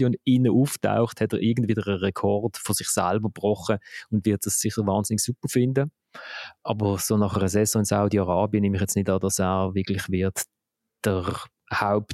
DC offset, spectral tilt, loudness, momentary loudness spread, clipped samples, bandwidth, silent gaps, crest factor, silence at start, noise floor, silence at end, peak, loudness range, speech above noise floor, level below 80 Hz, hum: under 0.1%; -5.5 dB/octave; -24 LUFS; 8 LU; under 0.1%; 16 kHz; none; 18 dB; 0 s; -82 dBFS; 0 s; -6 dBFS; 2 LU; 58 dB; -56 dBFS; none